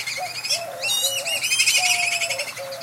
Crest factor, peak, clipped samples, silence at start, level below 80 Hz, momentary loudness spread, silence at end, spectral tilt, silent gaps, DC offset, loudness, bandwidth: 18 dB; -6 dBFS; under 0.1%; 0 s; -76 dBFS; 10 LU; 0 s; 2 dB/octave; none; under 0.1%; -20 LUFS; 16 kHz